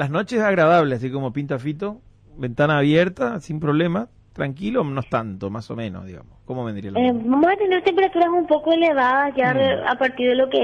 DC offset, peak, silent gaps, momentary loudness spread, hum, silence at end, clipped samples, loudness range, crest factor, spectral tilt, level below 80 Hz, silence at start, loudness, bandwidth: under 0.1%; -6 dBFS; none; 13 LU; none; 0 s; under 0.1%; 7 LU; 14 dB; -7.5 dB/octave; -52 dBFS; 0 s; -20 LUFS; 9.6 kHz